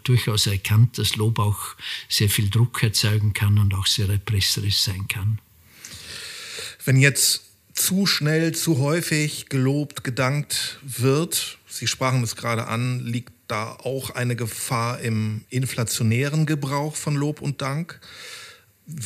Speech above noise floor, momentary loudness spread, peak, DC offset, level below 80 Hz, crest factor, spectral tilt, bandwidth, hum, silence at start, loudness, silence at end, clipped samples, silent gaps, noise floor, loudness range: 22 dB; 12 LU; -4 dBFS; under 0.1%; -54 dBFS; 20 dB; -4 dB/octave; 15.5 kHz; none; 0.05 s; -22 LUFS; 0 s; under 0.1%; none; -44 dBFS; 5 LU